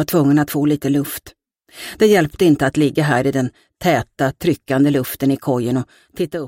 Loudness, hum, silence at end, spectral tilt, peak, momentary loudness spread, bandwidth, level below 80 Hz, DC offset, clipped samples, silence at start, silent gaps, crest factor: -17 LUFS; none; 0 s; -6 dB/octave; -2 dBFS; 11 LU; 17 kHz; -48 dBFS; under 0.1%; under 0.1%; 0 s; none; 16 dB